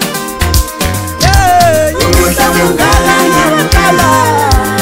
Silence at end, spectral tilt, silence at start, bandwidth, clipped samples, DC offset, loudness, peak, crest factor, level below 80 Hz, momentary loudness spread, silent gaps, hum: 0 s; -4 dB/octave; 0 s; 16.5 kHz; 0.2%; under 0.1%; -9 LUFS; 0 dBFS; 8 dB; -18 dBFS; 6 LU; none; none